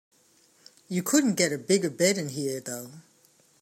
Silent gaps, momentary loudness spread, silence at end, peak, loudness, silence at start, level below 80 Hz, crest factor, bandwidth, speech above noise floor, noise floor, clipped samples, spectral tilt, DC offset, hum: none; 13 LU; 0.6 s; -8 dBFS; -26 LUFS; 0.9 s; -76 dBFS; 20 dB; 16 kHz; 36 dB; -62 dBFS; under 0.1%; -4 dB/octave; under 0.1%; none